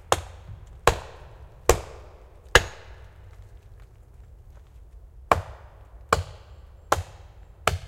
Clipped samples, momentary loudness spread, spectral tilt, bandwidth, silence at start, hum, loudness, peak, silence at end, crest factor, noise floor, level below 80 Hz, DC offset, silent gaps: under 0.1%; 27 LU; -3 dB/octave; 16.5 kHz; 0.1 s; none; -25 LUFS; 0 dBFS; 0 s; 30 dB; -48 dBFS; -40 dBFS; under 0.1%; none